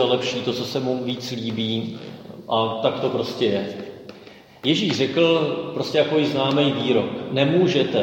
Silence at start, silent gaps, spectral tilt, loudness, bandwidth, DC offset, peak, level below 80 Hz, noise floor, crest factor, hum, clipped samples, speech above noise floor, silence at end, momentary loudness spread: 0 s; none; -5.5 dB/octave; -22 LUFS; 16.5 kHz; under 0.1%; -4 dBFS; -64 dBFS; -45 dBFS; 18 dB; none; under 0.1%; 24 dB; 0 s; 14 LU